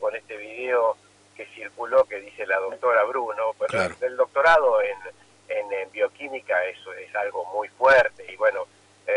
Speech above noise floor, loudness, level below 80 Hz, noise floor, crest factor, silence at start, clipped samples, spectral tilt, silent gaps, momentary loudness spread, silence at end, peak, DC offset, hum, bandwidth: 23 dB; -23 LUFS; -62 dBFS; -45 dBFS; 16 dB; 0 s; under 0.1%; -4 dB/octave; none; 19 LU; 0 s; -8 dBFS; under 0.1%; 50 Hz at -65 dBFS; 11 kHz